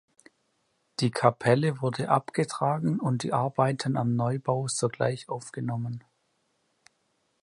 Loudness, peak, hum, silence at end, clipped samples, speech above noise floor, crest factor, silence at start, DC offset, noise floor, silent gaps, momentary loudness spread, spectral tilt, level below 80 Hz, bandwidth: -28 LUFS; -6 dBFS; none; 1.45 s; under 0.1%; 47 dB; 24 dB; 1 s; under 0.1%; -73 dBFS; none; 10 LU; -6 dB/octave; -68 dBFS; 11.5 kHz